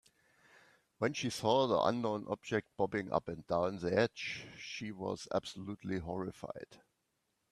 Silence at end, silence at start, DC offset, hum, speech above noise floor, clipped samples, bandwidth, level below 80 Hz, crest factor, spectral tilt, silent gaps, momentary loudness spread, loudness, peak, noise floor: 0.75 s; 1 s; under 0.1%; none; 46 dB; under 0.1%; 13.5 kHz; -68 dBFS; 22 dB; -5 dB/octave; none; 13 LU; -36 LUFS; -16 dBFS; -82 dBFS